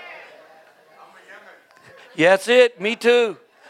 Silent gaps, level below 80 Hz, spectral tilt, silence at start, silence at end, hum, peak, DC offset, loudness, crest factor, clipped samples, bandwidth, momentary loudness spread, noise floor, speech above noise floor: none; -82 dBFS; -3.5 dB/octave; 0.05 s; 0.35 s; none; 0 dBFS; under 0.1%; -17 LUFS; 20 dB; under 0.1%; 13.5 kHz; 17 LU; -50 dBFS; 34 dB